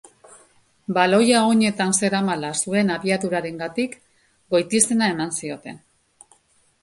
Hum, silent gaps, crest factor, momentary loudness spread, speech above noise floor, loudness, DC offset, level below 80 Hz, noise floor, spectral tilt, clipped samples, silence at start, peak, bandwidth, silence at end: none; none; 22 dB; 12 LU; 41 dB; -20 LUFS; under 0.1%; -64 dBFS; -61 dBFS; -3.5 dB/octave; under 0.1%; 0.9 s; 0 dBFS; 11.5 kHz; 1.05 s